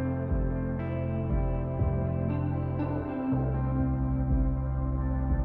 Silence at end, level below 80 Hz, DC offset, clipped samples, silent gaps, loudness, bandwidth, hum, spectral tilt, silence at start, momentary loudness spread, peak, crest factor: 0 s; -34 dBFS; under 0.1%; under 0.1%; none; -30 LUFS; 3.2 kHz; none; -12.5 dB/octave; 0 s; 3 LU; -16 dBFS; 12 dB